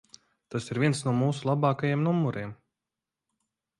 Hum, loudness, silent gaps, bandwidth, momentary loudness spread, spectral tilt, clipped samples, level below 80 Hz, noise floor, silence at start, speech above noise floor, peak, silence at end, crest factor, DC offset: none; -28 LUFS; none; 11.5 kHz; 11 LU; -6.5 dB/octave; under 0.1%; -66 dBFS; -89 dBFS; 0.5 s; 62 dB; -12 dBFS; 1.25 s; 16 dB; under 0.1%